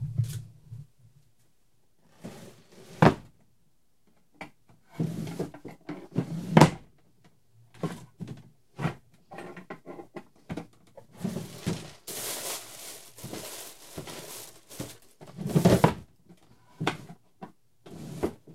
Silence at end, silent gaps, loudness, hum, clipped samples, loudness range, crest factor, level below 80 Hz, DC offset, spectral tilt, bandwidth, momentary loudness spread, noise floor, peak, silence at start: 0 s; none; -29 LUFS; none; under 0.1%; 11 LU; 32 dB; -54 dBFS; 0.1%; -6 dB/octave; 16 kHz; 25 LU; -72 dBFS; 0 dBFS; 0 s